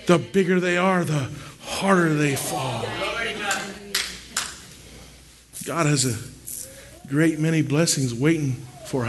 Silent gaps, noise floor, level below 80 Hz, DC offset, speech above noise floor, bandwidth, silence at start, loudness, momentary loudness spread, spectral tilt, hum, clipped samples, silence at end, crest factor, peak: none; -48 dBFS; -52 dBFS; under 0.1%; 26 dB; 12.5 kHz; 0 s; -23 LUFS; 15 LU; -4.5 dB/octave; none; under 0.1%; 0 s; 18 dB; -4 dBFS